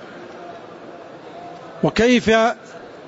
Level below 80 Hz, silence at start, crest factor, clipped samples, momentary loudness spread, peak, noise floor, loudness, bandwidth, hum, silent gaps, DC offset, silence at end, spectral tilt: -48 dBFS; 0 s; 18 dB; under 0.1%; 23 LU; -4 dBFS; -38 dBFS; -17 LUFS; 8 kHz; none; none; under 0.1%; 0 s; -5 dB/octave